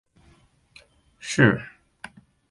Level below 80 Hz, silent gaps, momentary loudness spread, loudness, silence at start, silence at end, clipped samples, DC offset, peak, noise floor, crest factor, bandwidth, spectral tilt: -58 dBFS; none; 25 LU; -21 LUFS; 1.25 s; 0.8 s; under 0.1%; under 0.1%; -4 dBFS; -59 dBFS; 24 dB; 11.5 kHz; -5.5 dB/octave